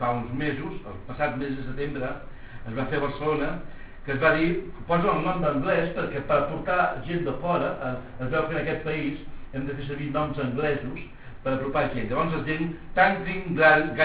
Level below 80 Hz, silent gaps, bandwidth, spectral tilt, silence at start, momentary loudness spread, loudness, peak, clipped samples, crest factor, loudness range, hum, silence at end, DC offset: -44 dBFS; none; 4 kHz; -10 dB/octave; 0 s; 14 LU; -26 LUFS; -4 dBFS; under 0.1%; 22 dB; 5 LU; none; 0 s; under 0.1%